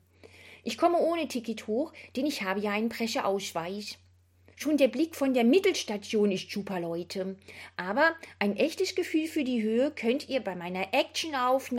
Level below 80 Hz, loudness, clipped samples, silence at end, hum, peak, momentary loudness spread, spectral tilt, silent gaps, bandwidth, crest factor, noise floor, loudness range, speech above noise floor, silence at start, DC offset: -78 dBFS; -29 LUFS; under 0.1%; 0 s; none; -10 dBFS; 11 LU; -4.5 dB/octave; none; 16.5 kHz; 18 dB; -61 dBFS; 3 LU; 32 dB; 0.25 s; under 0.1%